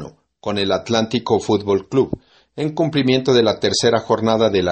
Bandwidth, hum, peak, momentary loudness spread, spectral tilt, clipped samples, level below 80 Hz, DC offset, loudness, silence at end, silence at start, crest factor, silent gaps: 8.8 kHz; none; -2 dBFS; 10 LU; -5 dB/octave; under 0.1%; -50 dBFS; under 0.1%; -18 LUFS; 0 s; 0 s; 16 dB; none